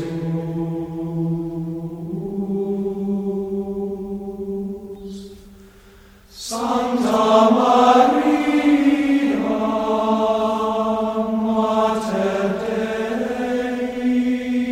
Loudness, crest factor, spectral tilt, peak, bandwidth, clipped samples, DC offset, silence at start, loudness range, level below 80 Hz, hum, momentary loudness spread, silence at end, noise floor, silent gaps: -20 LUFS; 18 dB; -6 dB/octave; -2 dBFS; 15.5 kHz; under 0.1%; under 0.1%; 0 s; 11 LU; -50 dBFS; none; 14 LU; 0 s; -47 dBFS; none